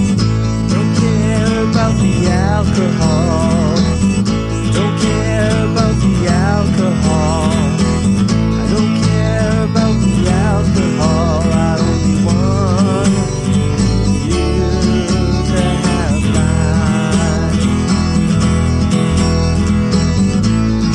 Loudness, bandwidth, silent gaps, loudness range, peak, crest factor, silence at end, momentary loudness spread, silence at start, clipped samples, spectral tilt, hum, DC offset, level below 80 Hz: -14 LUFS; 11 kHz; none; 1 LU; 0 dBFS; 12 dB; 0 s; 2 LU; 0 s; under 0.1%; -6.5 dB/octave; none; under 0.1%; -24 dBFS